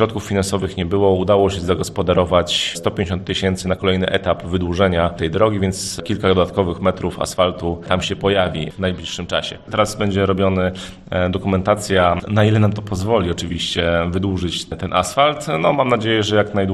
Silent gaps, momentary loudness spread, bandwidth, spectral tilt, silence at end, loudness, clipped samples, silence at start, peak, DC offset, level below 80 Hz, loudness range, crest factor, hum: none; 7 LU; 13 kHz; -5.5 dB/octave; 0 s; -18 LUFS; under 0.1%; 0 s; 0 dBFS; under 0.1%; -44 dBFS; 2 LU; 18 dB; none